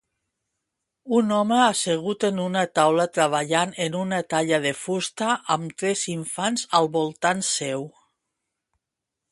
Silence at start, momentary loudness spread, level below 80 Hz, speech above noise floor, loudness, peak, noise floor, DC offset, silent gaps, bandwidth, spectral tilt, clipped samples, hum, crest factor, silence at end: 1.05 s; 7 LU; -70 dBFS; 62 dB; -23 LUFS; -2 dBFS; -85 dBFS; under 0.1%; none; 11.5 kHz; -3.5 dB/octave; under 0.1%; none; 22 dB; 1.45 s